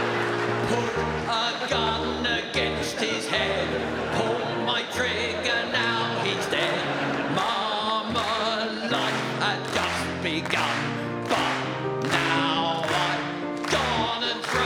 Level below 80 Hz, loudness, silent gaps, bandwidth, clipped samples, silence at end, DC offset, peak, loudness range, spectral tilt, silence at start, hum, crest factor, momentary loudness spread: -52 dBFS; -25 LUFS; none; over 20 kHz; under 0.1%; 0 s; under 0.1%; -8 dBFS; 1 LU; -4 dB/octave; 0 s; none; 18 dB; 3 LU